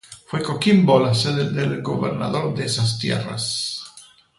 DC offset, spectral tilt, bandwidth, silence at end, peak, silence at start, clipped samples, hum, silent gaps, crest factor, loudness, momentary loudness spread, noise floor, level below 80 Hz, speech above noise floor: under 0.1%; -5.5 dB/octave; 11.5 kHz; 0.4 s; -4 dBFS; 0.1 s; under 0.1%; none; none; 18 dB; -21 LUFS; 11 LU; -48 dBFS; -54 dBFS; 28 dB